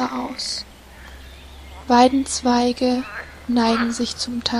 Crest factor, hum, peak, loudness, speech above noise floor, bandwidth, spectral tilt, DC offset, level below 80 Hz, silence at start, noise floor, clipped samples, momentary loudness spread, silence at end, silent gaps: 18 dB; none; -2 dBFS; -20 LUFS; 22 dB; 13 kHz; -3.5 dB/octave; under 0.1%; -44 dBFS; 0 s; -41 dBFS; under 0.1%; 25 LU; 0 s; none